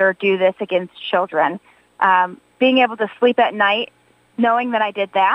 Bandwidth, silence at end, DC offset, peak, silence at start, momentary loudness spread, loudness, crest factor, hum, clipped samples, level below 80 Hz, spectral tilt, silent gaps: 9 kHz; 0 s; under 0.1%; -2 dBFS; 0 s; 7 LU; -18 LUFS; 16 dB; none; under 0.1%; -74 dBFS; -6.5 dB/octave; none